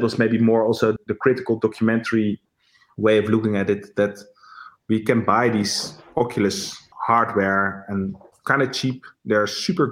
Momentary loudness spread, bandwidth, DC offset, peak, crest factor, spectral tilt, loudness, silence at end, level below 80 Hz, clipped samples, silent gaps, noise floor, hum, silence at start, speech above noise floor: 9 LU; 16 kHz; under 0.1%; -2 dBFS; 18 dB; -5.5 dB/octave; -21 LUFS; 0 s; -62 dBFS; under 0.1%; none; -60 dBFS; none; 0 s; 39 dB